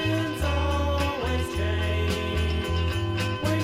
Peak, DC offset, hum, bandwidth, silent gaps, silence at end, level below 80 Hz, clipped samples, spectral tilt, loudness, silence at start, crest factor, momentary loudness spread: -14 dBFS; under 0.1%; none; 15.5 kHz; none; 0 s; -32 dBFS; under 0.1%; -6 dB/octave; -26 LUFS; 0 s; 12 dB; 2 LU